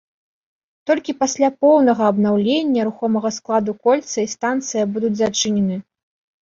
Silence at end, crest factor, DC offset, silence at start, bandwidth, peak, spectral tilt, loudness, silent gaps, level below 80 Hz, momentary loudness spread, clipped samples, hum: 0.65 s; 16 dB; under 0.1%; 0.85 s; 7.6 kHz; -4 dBFS; -4.5 dB/octave; -18 LUFS; none; -60 dBFS; 8 LU; under 0.1%; none